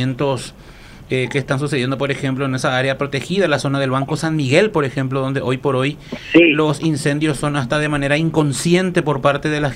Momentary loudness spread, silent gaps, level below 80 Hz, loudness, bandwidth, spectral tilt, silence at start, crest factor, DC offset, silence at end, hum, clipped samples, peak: 6 LU; none; -44 dBFS; -18 LUFS; 14.5 kHz; -5.5 dB/octave; 0 s; 18 dB; under 0.1%; 0 s; none; under 0.1%; 0 dBFS